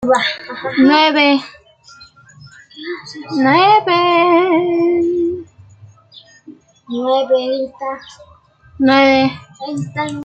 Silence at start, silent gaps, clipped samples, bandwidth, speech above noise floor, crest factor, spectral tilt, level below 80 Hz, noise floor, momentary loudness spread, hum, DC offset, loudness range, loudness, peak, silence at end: 0 s; none; under 0.1%; 8.8 kHz; 30 dB; 14 dB; -5 dB/octave; -56 dBFS; -44 dBFS; 17 LU; none; under 0.1%; 7 LU; -14 LUFS; -2 dBFS; 0 s